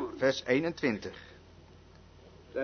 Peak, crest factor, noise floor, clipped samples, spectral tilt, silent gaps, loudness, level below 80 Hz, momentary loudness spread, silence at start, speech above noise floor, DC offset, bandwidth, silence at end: -14 dBFS; 20 dB; -55 dBFS; under 0.1%; -5 dB/octave; none; -31 LUFS; -62 dBFS; 20 LU; 0 s; 25 dB; under 0.1%; 6.6 kHz; 0 s